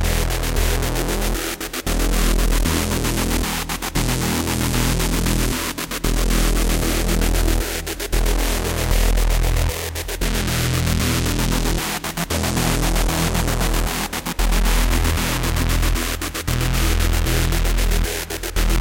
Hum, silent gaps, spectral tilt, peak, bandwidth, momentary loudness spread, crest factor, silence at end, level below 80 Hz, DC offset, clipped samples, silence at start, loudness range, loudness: none; none; -4 dB/octave; -4 dBFS; 17.5 kHz; 4 LU; 16 dB; 0 s; -22 dBFS; under 0.1%; under 0.1%; 0 s; 1 LU; -21 LUFS